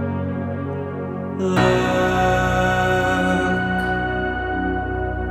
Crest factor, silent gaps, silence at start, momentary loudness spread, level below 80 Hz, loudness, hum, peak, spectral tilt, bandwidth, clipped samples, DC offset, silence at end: 16 dB; none; 0 s; 9 LU; -34 dBFS; -20 LUFS; none; -4 dBFS; -6 dB/octave; 14 kHz; under 0.1%; under 0.1%; 0 s